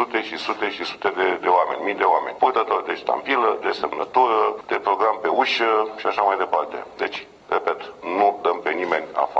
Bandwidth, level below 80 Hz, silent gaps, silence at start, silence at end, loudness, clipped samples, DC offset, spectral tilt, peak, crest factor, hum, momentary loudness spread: 8.2 kHz; -66 dBFS; none; 0 s; 0 s; -22 LUFS; under 0.1%; under 0.1%; -4 dB/octave; -4 dBFS; 18 dB; none; 8 LU